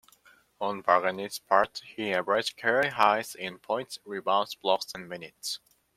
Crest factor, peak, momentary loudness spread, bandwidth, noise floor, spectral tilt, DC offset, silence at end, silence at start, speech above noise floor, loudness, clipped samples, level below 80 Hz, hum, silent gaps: 24 dB; -6 dBFS; 13 LU; 16 kHz; -61 dBFS; -3 dB/octave; under 0.1%; 0.4 s; 0.6 s; 32 dB; -28 LUFS; under 0.1%; -72 dBFS; none; none